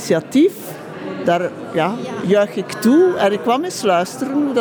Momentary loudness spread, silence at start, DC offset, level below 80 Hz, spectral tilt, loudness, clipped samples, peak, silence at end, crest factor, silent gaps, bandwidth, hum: 10 LU; 0 s; under 0.1%; -66 dBFS; -5.5 dB/octave; -17 LUFS; under 0.1%; -4 dBFS; 0 s; 14 dB; none; over 20 kHz; none